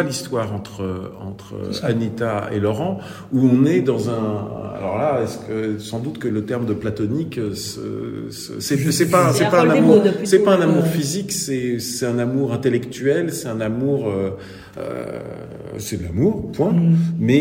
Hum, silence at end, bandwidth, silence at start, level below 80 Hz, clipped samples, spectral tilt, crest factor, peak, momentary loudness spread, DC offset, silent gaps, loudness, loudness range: none; 0 s; 16.5 kHz; 0 s; -54 dBFS; under 0.1%; -6 dB/octave; 18 dB; 0 dBFS; 15 LU; under 0.1%; none; -20 LUFS; 8 LU